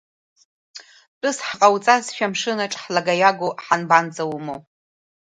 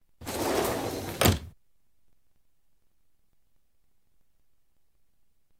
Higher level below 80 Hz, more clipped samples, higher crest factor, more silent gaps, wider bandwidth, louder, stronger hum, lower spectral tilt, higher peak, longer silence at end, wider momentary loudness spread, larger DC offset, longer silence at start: second, -70 dBFS vs -50 dBFS; neither; second, 20 dB vs 28 dB; first, 1.08-1.21 s vs none; second, 9.6 kHz vs over 20 kHz; first, -20 LUFS vs -28 LUFS; neither; about the same, -3.5 dB/octave vs -4 dB/octave; first, 0 dBFS vs -6 dBFS; second, 0.8 s vs 4.1 s; about the same, 11 LU vs 9 LU; neither; first, 0.75 s vs 0.2 s